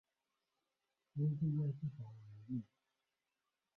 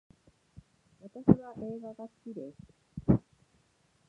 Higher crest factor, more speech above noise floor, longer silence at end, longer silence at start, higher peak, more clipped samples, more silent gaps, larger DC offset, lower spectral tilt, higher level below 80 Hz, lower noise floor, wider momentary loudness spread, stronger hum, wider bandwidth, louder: second, 16 dB vs 28 dB; first, over 50 dB vs 38 dB; first, 1.15 s vs 0.9 s; about the same, 1.15 s vs 1.05 s; second, -28 dBFS vs -6 dBFS; neither; neither; neither; first, -13 dB/octave vs -11.5 dB/octave; second, -78 dBFS vs -52 dBFS; first, under -90 dBFS vs -70 dBFS; second, 17 LU vs 21 LU; neither; second, 2 kHz vs 4 kHz; second, -42 LUFS vs -31 LUFS